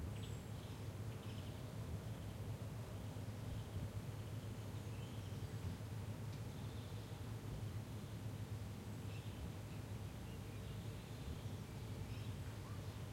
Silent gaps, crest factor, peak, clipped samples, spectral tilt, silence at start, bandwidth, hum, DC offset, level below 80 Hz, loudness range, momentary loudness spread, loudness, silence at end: none; 14 dB; -34 dBFS; under 0.1%; -6 dB/octave; 0 s; 16.5 kHz; none; under 0.1%; -60 dBFS; 1 LU; 2 LU; -49 LUFS; 0 s